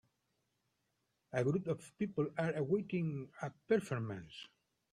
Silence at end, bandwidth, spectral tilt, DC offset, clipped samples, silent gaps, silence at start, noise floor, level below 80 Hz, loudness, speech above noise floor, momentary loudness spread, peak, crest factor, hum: 0.45 s; 13 kHz; -7.5 dB/octave; under 0.1%; under 0.1%; none; 1.35 s; -83 dBFS; -74 dBFS; -38 LUFS; 46 dB; 12 LU; -20 dBFS; 20 dB; none